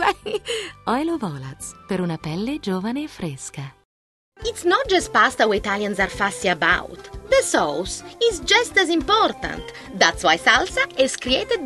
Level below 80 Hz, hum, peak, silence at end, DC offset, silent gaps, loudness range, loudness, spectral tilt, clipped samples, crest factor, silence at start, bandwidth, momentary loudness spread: -44 dBFS; none; 0 dBFS; 0 s; under 0.1%; 3.85-4.32 s; 8 LU; -20 LUFS; -3 dB/octave; under 0.1%; 22 dB; 0 s; 13 kHz; 14 LU